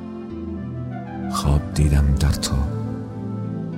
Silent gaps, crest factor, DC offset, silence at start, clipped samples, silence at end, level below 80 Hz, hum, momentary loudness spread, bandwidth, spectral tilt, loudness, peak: none; 18 dB; under 0.1%; 0 s; under 0.1%; 0 s; -26 dBFS; none; 12 LU; 15 kHz; -6 dB/octave; -23 LUFS; -4 dBFS